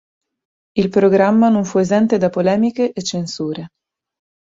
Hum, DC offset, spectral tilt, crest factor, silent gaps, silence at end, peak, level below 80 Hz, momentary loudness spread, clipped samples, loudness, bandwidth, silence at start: none; under 0.1%; -6 dB/octave; 16 dB; none; 0.75 s; -2 dBFS; -56 dBFS; 12 LU; under 0.1%; -16 LUFS; 7.8 kHz; 0.75 s